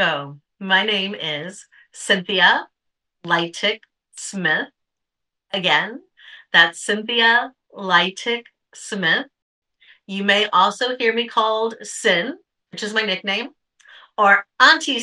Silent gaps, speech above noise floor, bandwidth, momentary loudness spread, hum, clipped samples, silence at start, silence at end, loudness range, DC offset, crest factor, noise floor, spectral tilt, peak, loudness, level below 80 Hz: 9.42-9.62 s; 62 dB; 12 kHz; 18 LU; none; under 0.1%; 0 s; 0 s; 4 LU; under 0.1%; 20 dB; -81 dBFS; -2.5 dB/octave; 0 dBFS; -18 LUFS; -80 dBFS